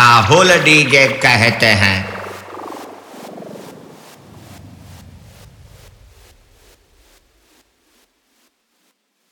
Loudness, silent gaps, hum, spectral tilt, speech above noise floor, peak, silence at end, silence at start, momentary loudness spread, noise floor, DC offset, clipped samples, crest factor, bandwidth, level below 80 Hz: -10 LUFS; none; none; -3.5 dB/octave; 52 dB; 0 dBFS; 5.6 s; 0 s; 26 LU; -64 dBFS; under 0.1%; under 0.1%; 18 dB; over 20 kHz; -50 dBFS